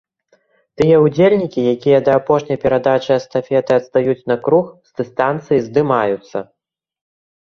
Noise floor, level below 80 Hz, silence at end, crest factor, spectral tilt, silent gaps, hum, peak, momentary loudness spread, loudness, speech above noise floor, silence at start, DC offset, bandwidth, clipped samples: -59 dBFS; -54 dBFS; 0.95 s; 16 dB; -7.5 dB/octave; none; none; 0 dBFS; 9 LU; -15 LUFS; 45 dB; 0.8 s; under 0.1%; 7.2 kHz; under 0.1%